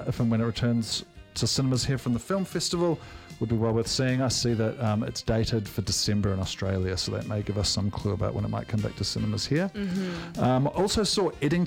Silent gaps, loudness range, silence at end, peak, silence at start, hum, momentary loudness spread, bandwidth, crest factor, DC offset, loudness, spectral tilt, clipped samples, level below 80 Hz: none; 2 LU; 0 s; -12 dBFS; 0 s; none; 6 LU; 16.5 kHz; 14 dB; under 0.1%; -27 LUFS; -5 dB/octave; under 0.1%; -46 dBFS